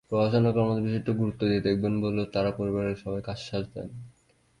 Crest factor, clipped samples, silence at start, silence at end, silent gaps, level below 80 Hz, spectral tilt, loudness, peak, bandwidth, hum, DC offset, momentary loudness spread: 16 dB; under 0.1%; 0.1 s; 0.5 s; none; -52 dBFS; -8 dB/octave; -28 LUFS; -12 dBFS; 11 kHz; none; under 0.1%; 11 LU